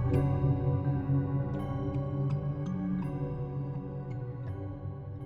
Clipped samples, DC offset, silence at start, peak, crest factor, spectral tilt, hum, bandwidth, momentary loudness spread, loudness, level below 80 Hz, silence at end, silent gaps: under 0.1%; under 0.1%; 0 s; -16 dBFS; 16 dB; -10.5 dB/octave; none; 4 kHz; 10 LU; -33 LUFS; -48 dBFS; 0 s; none